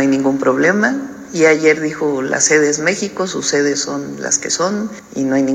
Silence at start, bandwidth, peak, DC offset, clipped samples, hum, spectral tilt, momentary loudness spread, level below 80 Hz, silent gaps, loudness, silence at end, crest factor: 0 s; 13.5 kHz; 0 dBFS; under 0.1%; under 0.1%; none; -3 dB/octave; 10 LU; -56 dBFS; none; -15 LUFS; 0 s; 16 dB